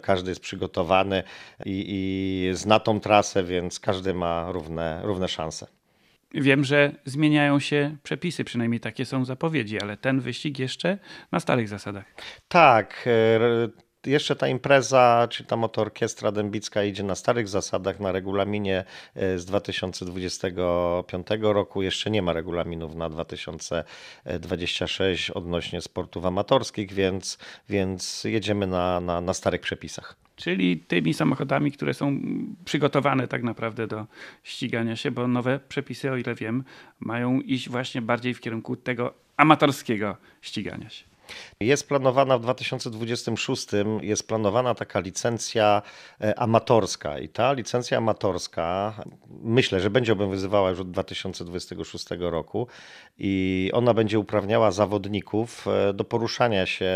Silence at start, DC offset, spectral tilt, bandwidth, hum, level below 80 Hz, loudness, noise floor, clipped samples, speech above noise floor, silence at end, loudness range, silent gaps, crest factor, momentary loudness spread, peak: 0.05 s; under 0.1%; -5 dB/octave; 15 kHz; none; -56 dBFS; -25 LUFS; -64 dBFS; under 0.1%; 39 dB; 0 s; 6 LU; none; 24 dB; 12 LU; 0 dBFS